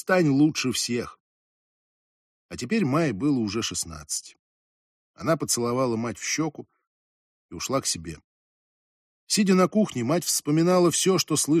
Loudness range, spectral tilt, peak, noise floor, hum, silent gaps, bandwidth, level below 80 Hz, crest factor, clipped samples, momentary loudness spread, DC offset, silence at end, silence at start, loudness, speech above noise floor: 6 LU; -4 dB/octave; -8 dBFS; under -90 dBFS; none; 1.20-2.49 s, 4.39-5.14 s, 6.87-7.49 s, 8.24-9.27 s; 15 kHz; -60 dBFS; 18 dB; under 0.1%; 12 LU; under 0.1%; 0 s; 0.05 s; -24 LUFS; over 66 dB